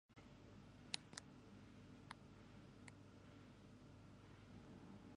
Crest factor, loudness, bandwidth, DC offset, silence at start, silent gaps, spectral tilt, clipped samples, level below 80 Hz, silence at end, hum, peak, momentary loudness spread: 38 dB; -59 LUFS; 10.5 kHz; under 0.1%; 0.1 s; none; -3.5 dB/octave; under 0.1%; -74 dBFS; 0 s; none; -22 dBFS; 13 LU